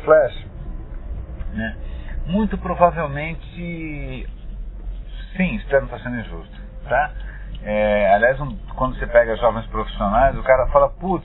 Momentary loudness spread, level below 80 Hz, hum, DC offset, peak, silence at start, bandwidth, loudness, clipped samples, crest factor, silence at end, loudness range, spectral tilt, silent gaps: 20 LU; -30 dBFS; none; under 0.1%; 0 dBFS; 0 s; 4.1 kHz; -20 LUFS; under 0.1%; 20 dB; 0 s; 8 LU; -11 dB/octave; none